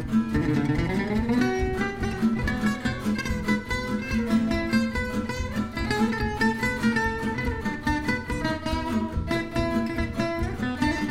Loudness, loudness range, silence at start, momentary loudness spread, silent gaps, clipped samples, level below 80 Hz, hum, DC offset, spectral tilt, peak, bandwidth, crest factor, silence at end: -26 LUFS; 2 LU; 0 s; 4 LU; none; under 0.1%; -36 dBFS; none; under 0.1%; -6 dB/octave; -10 dBFS; 15.5 kHz; 16 dB; 0 s